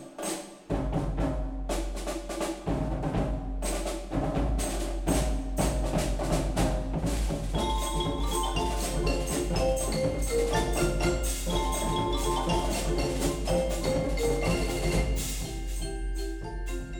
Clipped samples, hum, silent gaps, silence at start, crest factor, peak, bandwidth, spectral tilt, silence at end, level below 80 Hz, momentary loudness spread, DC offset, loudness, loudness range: under 0.1%; none; none; 0 s; 16 dB; -12 dBFS; over 20 kHz; -5 dB/octave; 0 s; -32 dBFS; 7 LU; under 0.1%; -30 LUFS; 4 LU